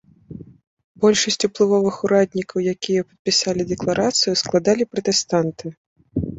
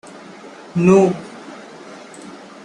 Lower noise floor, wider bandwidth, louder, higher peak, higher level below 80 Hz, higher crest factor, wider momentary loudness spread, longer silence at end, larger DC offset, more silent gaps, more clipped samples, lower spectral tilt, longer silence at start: about the same, -39 dBFS vs -38 dBFS; second, 8.2 kHz vs 10.5 kHz; second, -19 LUFS vs -16 LUFS; about the same, -4 dBFS vs -2 dBFS; first, -50 dBFS vs -58 dBFS; about the same, 18 dB vs 18 dB; second, 11 LU vs 25 LU; second, 0 s vs 0.35 s; neither; first, 0.67-0.77 s, 0.84-0.95 s, 3.19-3.25 s, 5.77-5.96 s vs none; neither; second, -4 dB/octave vs -7.5 dB/octave; second, 0.3 s vs 0.45 s